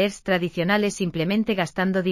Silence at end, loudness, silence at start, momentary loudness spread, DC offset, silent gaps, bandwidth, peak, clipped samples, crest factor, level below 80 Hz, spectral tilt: 0 s; -23 LUFS; 0 s; 3 LU; under 0.1%; none; 15 kHz; -8 dBFS; under 0.1%; 16 dB; -54 dBFS; -5.5 dB/octave